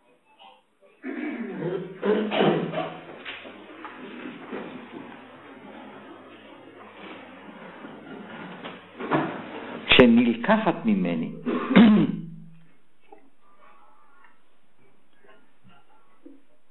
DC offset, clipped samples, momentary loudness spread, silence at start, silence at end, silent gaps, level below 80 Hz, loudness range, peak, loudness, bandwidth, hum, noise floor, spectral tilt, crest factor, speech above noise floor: under 0.1%; under 0.1%; 27 LU; 0.45 s; 4.2 s; none; -54 dBFS; 22 LU; -2 dBFS; -23 LUFS; 4.2 kHz; none; -65 dBFS; -8.5 dB/octave; 24 dB; 45 dB